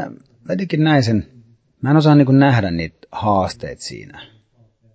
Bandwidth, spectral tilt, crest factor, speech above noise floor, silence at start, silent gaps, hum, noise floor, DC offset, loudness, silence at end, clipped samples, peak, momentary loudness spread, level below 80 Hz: 8 kHz; -7.5 dB/octave; 16 dB; 40 dB; 0 s; none; none; -55 dBFS; under 0.1%; -16 LUFS; 0.7 s; under 0.1%; -2 dBFS; 19 LU; -44 dBFS